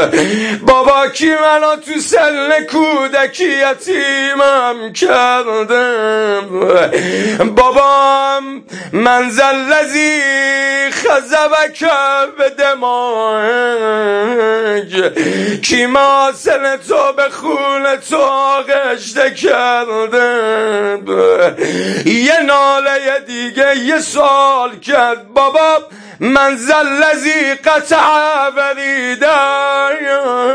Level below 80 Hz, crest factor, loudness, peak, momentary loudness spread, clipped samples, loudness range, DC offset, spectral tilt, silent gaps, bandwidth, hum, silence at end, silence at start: -48 dBFS; 12 dB; -12 LUFS; 0 dBFS; 5 LU; under 0.1%; 2 LU; under 0.1%; -3 dB/octave; none; 10.5 kHz; none; 0 s; 0 s